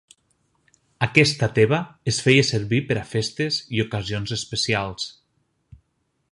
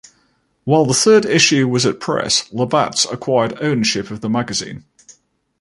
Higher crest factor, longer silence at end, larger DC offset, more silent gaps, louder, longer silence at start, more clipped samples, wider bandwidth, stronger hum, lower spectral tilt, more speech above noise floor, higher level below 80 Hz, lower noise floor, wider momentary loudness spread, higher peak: about the same, 22 dB vs 18 dB; first, 1.2 s vs 0.8 s; neither; neither; second, -22 LUFS vs -16 LUFS; first, 1 s vs 0.65 s; neither; about the same, 11.5 kHz vs 11.5 kHz; neither; about the same, -4.5 dB/octave vs -3.5 dB/octave; first, 50 dB vs 45 dB; about the same, -52 dBFS vs -54 dBFS; first, -72 dBFS vs -61 dBFS; about the same, 10 LU vs 10 LU; about the same, -2 dBFS vs 0 dBFS